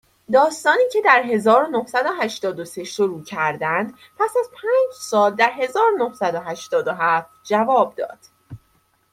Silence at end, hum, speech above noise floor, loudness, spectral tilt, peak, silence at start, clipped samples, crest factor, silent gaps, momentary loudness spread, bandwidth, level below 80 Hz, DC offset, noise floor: 0.55 s; none; 43 dB; -19 LUFS; -4 dB/octave; -2 dBFS; 0.3 s; under 0.1%; 18 dB; none; 8 LU; 15.5 kHz; -68 dBFS; under 0.1%; -62 dBFS